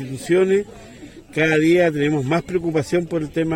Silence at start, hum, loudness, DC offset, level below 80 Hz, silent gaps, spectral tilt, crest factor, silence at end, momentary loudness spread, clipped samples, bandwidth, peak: 0 s; none; -19 LUFS; under 0.1%; -50 dBFS; none; -6.5 dB/octave; 14 dB; 0 s; 7 LU; under 0.1%; 16.5 kHz; -4 dBFS